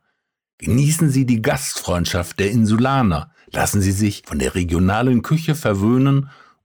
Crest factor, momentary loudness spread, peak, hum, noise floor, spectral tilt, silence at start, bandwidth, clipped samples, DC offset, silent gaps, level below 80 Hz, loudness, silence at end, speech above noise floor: 10 dB; 6 LU; -8 dBFS; none; -72 dBFS; -5.5 dB/octave; 0.6 s; over 20 kHz; under 0.1%; under 0.1%; none; -38 dBFS; -18 LUFS; 0.35 s; 55 dB